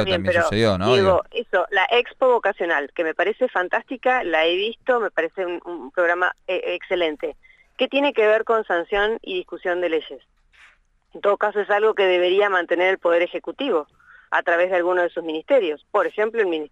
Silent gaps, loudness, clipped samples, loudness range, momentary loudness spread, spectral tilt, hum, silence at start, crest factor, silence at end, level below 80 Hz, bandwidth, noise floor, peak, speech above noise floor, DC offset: none; -21 LUFS; under 0.1%; 4 LU; 8 LU; -5.5 dB/octave; none; 0 s; 16 dB; 0.05 s; -54 dBFS; 10 kHz; -56 dBFS; -4 dBFS; 35 dB; under 0.1%